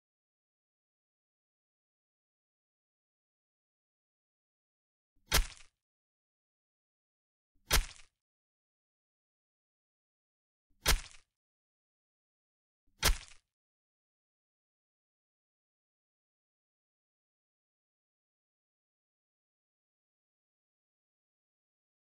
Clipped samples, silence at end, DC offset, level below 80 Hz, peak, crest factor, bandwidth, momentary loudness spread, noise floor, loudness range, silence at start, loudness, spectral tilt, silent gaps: under 0.1%; 8.85 s; under 0.1%; -46 dBFS; -14 dBFS; 30 dB; 10.5 kHz; 14 LU; under -90 dBFS; 3 LU; 5.3 s; -33 LUFS; -1.5 dB/octave; 5.82-7.55 s, 8.21-10.70 s, 11.36-12.87 s